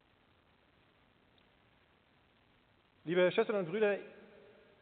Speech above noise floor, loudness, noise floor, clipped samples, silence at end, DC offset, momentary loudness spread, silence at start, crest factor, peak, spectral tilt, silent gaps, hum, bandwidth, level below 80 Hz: 37 dB; -33 LUFS; -70 dBFS; under 0.1%; 0.6 s; under 0.1%; 22 LU; 3.05 s; 20 dB; -20 dBFS; -4 dB/octave; none; none; 4.6 kHz; -82 dBFS